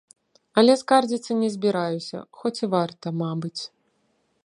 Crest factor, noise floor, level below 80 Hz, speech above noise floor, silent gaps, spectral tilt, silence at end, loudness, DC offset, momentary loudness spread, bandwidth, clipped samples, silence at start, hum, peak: 22 dB; -69 dBFS; -74 dBFS; 46 dB; none; -5.5 dB/octave; 0.75 s; -23 LUFS; under 0.1%; 14 LU; 11 kHz; under 0.1%; 0.55 s; none; -2 dBFS